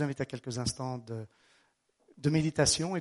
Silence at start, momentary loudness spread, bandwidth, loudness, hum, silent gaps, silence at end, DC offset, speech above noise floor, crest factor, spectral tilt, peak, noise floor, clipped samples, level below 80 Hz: 0 s; 16 LU; 11.5 kHz; -31 LUFS; none; none; 0 s; under 0.1%; 40 dB; 22 dB; -4.5 dB/octave; -12 dBFS; -72 dBFS; under 0.1%; -56 dBFS